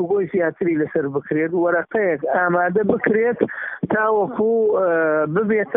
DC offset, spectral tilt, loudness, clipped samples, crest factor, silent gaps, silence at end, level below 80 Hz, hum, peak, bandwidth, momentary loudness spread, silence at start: under 0.1%; -7 dB/octave; -19 LUFS; under 0.1%; 16 dB; none; 0 s; -60 dBFS; none; -2 dBFS; 3.7 kHz; 5 LU; 0 s